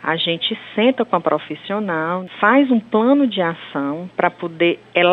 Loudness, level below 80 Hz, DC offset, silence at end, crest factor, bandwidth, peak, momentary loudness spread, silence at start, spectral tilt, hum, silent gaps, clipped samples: -18 LUFS; -68 dBFS; under 0.1%; 0 s; 16 dB; 4.3 kHz; -2 dBFS; 9 LU; 0 s; -7.5 dB/octave; none; none; under 0.1%